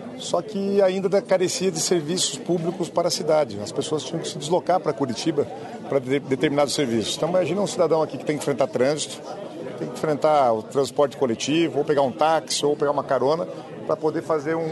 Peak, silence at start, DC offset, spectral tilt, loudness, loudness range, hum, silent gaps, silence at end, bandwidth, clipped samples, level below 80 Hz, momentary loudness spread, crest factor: -6 dBFS; 0 s; under 0.1%; -4.5 dB/octave; -23 LUFS; 2 LU; none; none; 0 s; 12.5 kHz; under 0.1%; -66 dBFS; 8 LU; 16 dB